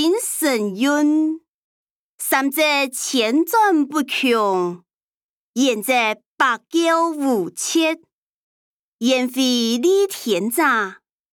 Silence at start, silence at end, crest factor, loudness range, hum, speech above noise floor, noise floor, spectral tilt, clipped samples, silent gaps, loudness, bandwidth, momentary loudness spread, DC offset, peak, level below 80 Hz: 0 s; 0.4 s; 16 dB; 2 LU; none; over 72 dB; under -90 dBFS; -2.5 dB/octave; under 0.1%; 1.49-2.18 s, 5.03-5.14 s, 5.22-5.54 s, 6.26-6.36 s, 8.13-8.99 s; -19 LUFS; 19.5 kHz; 6 LU; under 0.1%; -4 dBFS; -74 dBFS